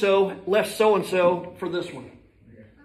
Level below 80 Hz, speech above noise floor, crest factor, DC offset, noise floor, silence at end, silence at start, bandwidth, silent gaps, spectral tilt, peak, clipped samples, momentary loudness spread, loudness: -62 dBFS; 28 dB; 16 dB; under 0.1%; -51 dBFS; 0.25 s; 0 s; 14.5 kHz; none; -5 dB/octave; -8 dBFS; under 0.1%; 11 LU; -23 LUFS